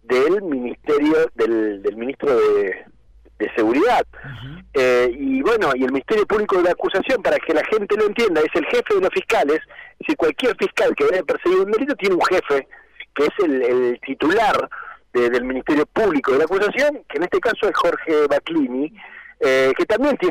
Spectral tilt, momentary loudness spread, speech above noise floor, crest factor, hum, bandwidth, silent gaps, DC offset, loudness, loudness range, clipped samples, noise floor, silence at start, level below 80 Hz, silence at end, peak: -5 dB/octave; 8 LU; 32 dB; 8 dB; none; 15.5 kHz; none; under 0.1%; -19 LUFS; 2 LU; under 0.1%; -50 dBFS; 0.1 s; -50 dBFS; 0 s; -12 dBFS